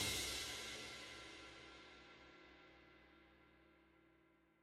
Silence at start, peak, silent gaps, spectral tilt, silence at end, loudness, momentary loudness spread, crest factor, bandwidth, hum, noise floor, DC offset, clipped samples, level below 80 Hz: 0 s; -30 dBFS; none; -1.5 dB/octave; 0.25 s; -48 LUFS; 24 LU; 24 dB; 16 kHz; none; -74 dBFS; under 0.1%; under 0.1%; -68 dBFS